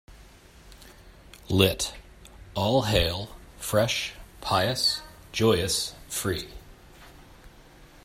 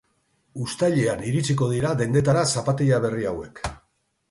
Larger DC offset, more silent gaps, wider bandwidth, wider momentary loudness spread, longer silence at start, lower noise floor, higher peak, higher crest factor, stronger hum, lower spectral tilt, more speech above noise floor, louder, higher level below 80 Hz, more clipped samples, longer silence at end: neither; neither; first, 16 kHz vs 11.5 kHz; about the same, 14 LU vs 13 LU; second, 0.1 s vs 0.55 s; second, -51 dBFS vs -69 dBFS; about the same, -6 dBFS vs -8 dBFS; first, 24 dB vs 16 dB; neither; second, -4 dB/octave vs -5.5 dB/octave; second, 26 dB vs 47 dB; second, -26 LUFS vs -23 LUFS; about the same, -46 dBFS vs -48 dBFS; neither; second, 0.2 s vs 0.55 s